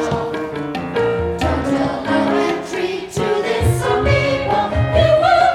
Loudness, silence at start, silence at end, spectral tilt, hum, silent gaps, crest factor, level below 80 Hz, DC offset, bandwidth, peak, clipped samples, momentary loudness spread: -17 LUFS; 0 s; 0 s; -6 dB/octave; none; none; 16 dB; -32 dBFS; under 0.1%; 15.5 kHz; -2 dBFS; under 0.1%; 9 LU